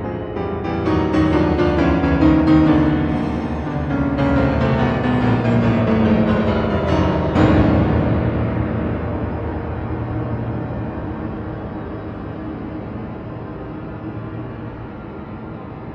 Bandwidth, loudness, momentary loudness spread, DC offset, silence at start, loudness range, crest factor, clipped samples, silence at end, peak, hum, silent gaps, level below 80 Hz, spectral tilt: 7.8 kHz; -19 LUFS; 15 LU; under 0.1%; 0 s; 13 LU; 16 dB; under 0.1%; 0 s; -2 dBFS; none; none; -30 dBFS; -9 dB/octave